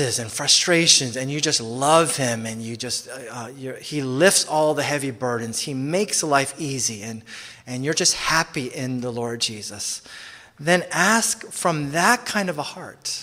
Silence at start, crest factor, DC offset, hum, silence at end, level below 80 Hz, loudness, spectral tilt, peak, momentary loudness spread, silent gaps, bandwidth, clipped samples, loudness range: 0 s; 22 dB; under 0.1%; none; 0 s; -58 dBFS; -21 LUFS; -2.5 dB/octave; 0 dBFS; 17 LU; none; 16 kHz; under 0.1%; 5 LU